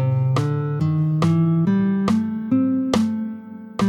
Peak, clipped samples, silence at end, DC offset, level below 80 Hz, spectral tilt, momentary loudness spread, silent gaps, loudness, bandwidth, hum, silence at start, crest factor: -2 dBFS; under 0.1%; 0 s; under 0.1%; -54 dBFS; -8 dB/octave; 8 LU; none; -20 LUFS; 11 kHz; none; 0 s; 16 dB